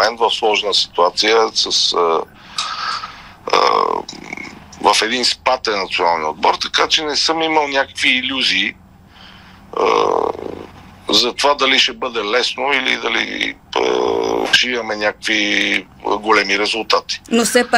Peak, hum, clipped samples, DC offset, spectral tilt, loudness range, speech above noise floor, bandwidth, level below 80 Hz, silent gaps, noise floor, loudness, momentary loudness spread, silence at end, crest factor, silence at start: 0 dBFS; none; under 0.1%; under 0.1%; -1.5 dB/octave; 2 LU; 26 dB; 16 kHz; -52 dBFS; none; -42 dBFS; -15 LUFS; 9 LU; 0 s; 18 dB; 0 s